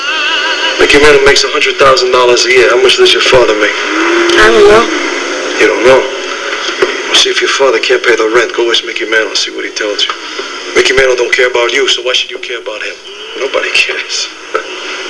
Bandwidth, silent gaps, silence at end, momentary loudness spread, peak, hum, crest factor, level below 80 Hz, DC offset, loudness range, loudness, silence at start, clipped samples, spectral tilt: 11 kHz; none; 0 s; 12 LU; 0 dBFS; none; 10 dB; -36 dBFS; 0.7%; 5 LU; -8 LUFS; 0 s; 2%; -2 dB/octave